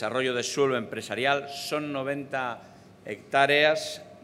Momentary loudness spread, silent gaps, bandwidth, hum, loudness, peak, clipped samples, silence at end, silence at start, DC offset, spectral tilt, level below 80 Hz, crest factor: 16 LU; none; 15.5 kHz; none; -26 LUFS; -6 dBFS; under 0.1%; 0.05 s; 0 s; under 0.1%; -3.5 dB/octave; -74 dBFS; 22 dB